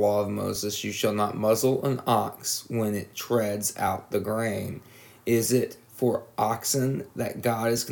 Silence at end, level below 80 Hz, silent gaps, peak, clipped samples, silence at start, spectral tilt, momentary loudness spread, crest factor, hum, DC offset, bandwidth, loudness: 0 s; -66 dBFS; none; -10 dBFS; under 0.1%; 0 s; -4.5 dB/octave; 7 LU; 16 dB; none; under 0.1%; 19.5 kHz; -27 LUFS